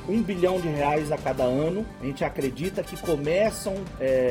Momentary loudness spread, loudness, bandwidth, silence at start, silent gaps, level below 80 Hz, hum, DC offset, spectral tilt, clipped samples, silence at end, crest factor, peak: 7 LU; -26 LUFS; 17 kHz; 0 s; none; -46 dBFS; none; under 0.1%; -6 dB/octave; under 0.1%; 0 s; 16 dB; -10 dBFS